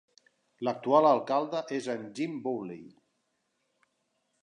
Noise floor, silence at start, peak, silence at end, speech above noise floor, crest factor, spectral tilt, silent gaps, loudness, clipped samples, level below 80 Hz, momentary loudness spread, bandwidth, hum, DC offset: -78 dBFS; 0.6 s; -10 dBFS; 1.55 s; 49 dB; 22 dB; -6 dB/octave; none; -29 LUFS; under 0.1%; -84 dBFS; 14 LU; 10.5 kHz; none; under 0.1%